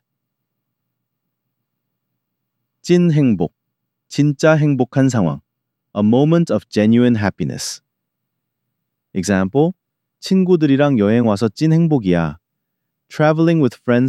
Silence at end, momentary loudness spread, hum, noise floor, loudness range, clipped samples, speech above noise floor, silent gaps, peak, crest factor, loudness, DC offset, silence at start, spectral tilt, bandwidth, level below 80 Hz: 0 s; 12 LU; none; -77 dBFS; 5 LU; under 0.1%; 62 dB; none; -2 dBFS; 16 dB; -16 LUFS; under 0.1%; 2.85 s; -7 dB/octave; 13 kHz; -54 dBFS